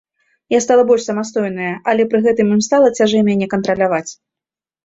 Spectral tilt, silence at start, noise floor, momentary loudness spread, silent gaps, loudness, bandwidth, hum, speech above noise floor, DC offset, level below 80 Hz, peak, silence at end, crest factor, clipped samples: -5 dB/octave; 0.5 s; -88 dBFS; 8 LU; none; -15 LUFS; 8 kHz; none; 74 dB; under 0.1%; -58 dBFS; -2 dBFS; 0.7 s; 14 dB; under 0.1%